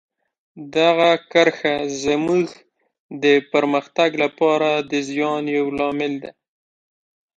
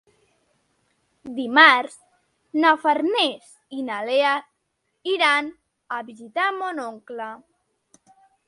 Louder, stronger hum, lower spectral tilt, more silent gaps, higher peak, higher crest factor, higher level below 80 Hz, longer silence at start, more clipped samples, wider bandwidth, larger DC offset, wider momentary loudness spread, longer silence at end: about the same, -19 LUFS vs -20 LUFS; neither; first, -4.5 dB/octave vs -2.5 dB/octave; first, 2.99-3.09 s vs none; about the same, 0 dBFS vs 0 dBFS; about the same, 20 dB vs 24 dB; first, -60 dBFS vs -76 dBFS; second, 0.55 s vs 1.25 s; neither; second, 9 kHz vs 11.5 kHz; neither; second, 9 LU vs 21 LU; about the same, 1.05 s vs 1.1 s